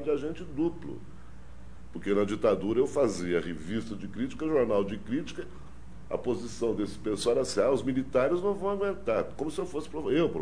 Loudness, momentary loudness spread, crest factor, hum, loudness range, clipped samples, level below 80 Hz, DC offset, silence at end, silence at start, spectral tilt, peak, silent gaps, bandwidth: -30 LUFS; 15 LU; 18 dB; none; 3 LU; under 0.1%; -50 dBFS; 0.9%; 0 s; 0 s; -6 dB/octave; -12 dBFS; none; 10.5 kHz